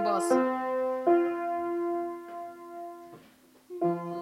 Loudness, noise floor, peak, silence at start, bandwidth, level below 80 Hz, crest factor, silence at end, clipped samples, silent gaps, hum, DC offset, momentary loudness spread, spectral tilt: -29 LUFS; -58 dBFS; -12 dBFS; 0 s; 13 kHz; -78 dBFS; 18 dB; 0 s; under 0.1%; none; none; under 0.1%; 17 LU; -6 dB/octave